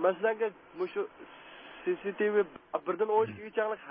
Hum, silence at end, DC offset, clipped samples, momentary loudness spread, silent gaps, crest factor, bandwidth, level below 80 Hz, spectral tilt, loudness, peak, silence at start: none; 0 s; under 0.1%; under 0.1%; 16 LU; none; 18 dB; 4.8 kHz; -74 dBFS; -9 dB/octave; -32 LUFS; -14 dBFS; 0 s